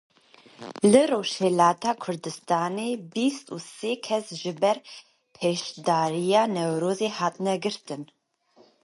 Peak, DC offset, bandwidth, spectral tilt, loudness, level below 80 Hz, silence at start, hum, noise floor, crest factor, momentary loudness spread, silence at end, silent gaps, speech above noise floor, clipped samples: -4 dBFS; under 0.1%; 11.5 kHz; -5 dB/octave; -25 LUFS; -72 dBFS; 0.6 s; none; -60 dBFS; 22 dB; 15 LU; 0.8 s; none; 35 dB; under 0.1%